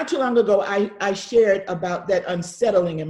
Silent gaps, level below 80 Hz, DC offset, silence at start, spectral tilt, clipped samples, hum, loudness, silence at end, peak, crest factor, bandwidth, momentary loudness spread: none; -58 dBFS; under 0.1%; 0 s; -5 dB/octave; under 0.1%; none; -21 LUFS; 0 s; -6 dBFS; 14 dB; 11.5 kHz; 8 LU